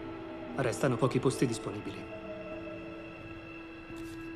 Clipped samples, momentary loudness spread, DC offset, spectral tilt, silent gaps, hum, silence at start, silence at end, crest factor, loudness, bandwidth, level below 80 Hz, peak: under 0.1%; 15 LU; under 0.1%; -6 dB/octave; none; none; 0 s; 0 s; 22 dB; -35 LUFS; 14.5 kHz; -58 dBFS; -14 dBFS